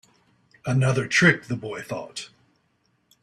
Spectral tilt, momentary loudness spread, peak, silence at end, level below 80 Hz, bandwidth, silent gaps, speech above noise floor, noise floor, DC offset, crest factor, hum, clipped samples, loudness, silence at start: -5 dB/octave; 19 LU; -4 dBFS; 0.95 s; -60 dBFS; 12.5 kHz; none; 46 dB; -69 dBFS; under 0.1%; 22 dB; none; under 0.1%; -22 LUFS; 0.65 s